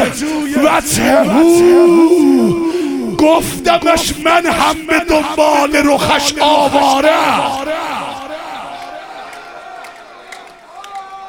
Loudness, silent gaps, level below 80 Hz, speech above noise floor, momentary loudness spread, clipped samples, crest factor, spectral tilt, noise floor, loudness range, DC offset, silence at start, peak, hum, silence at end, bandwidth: -11 LUFS; none; -40 dBFS; 24 dB; 21 LU; under 0.1%; 12 dB; -4 dB/octave; -34 dBFS; 13 LU; under 0.1%; 0 s; 0 dBFS; none; 0 s; 18 kHz